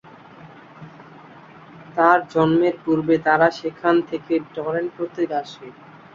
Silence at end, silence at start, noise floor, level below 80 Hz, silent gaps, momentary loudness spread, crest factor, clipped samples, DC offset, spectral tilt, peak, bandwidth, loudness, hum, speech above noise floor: 0.45 s; 0.45 s; -44 dBFS; -62 dBFS; none; 14 LU; 20 dB; under 0.1%; under 0.1%; -7 dB/octave; -2 dBFS; 7.2 kHz; -20 LUFS; none; 24 dB